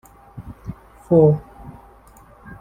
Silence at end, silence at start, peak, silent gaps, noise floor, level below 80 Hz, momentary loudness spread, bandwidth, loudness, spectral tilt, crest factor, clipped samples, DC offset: 0.05 s; 0.35 s; -2 dBFS; none; -48 dBFS; -46 dBFS; 27 LU; 8.8 kHz; -17 LUFS; -11 dB/octave; 20 dB; under 0.1%; under 0.1%